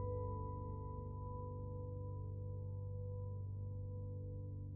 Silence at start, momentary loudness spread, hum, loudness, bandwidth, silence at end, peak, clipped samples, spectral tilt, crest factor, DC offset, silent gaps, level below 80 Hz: 0 s; 3 LU; 50 Hz at -75 dBFS; -47 LUFS; 1.1 kHz; 0 s; -34 dBFS; under 0.1%; -12.5 dB/octave; 12 dB; under 0.1%; none; -54 dBFS